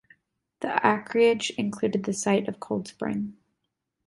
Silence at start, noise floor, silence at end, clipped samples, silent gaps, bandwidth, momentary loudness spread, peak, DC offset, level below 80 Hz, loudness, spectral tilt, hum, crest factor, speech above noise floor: 0.6 s; -81 dBFS; 0.75 s; under 0.1%; none; 11.5 kHz; 10 LU; -4 dBFS; under 0.1%; -66 dBFS; -26 LUFS; -4.5 dB/octave; none; 22 dB; 55 dB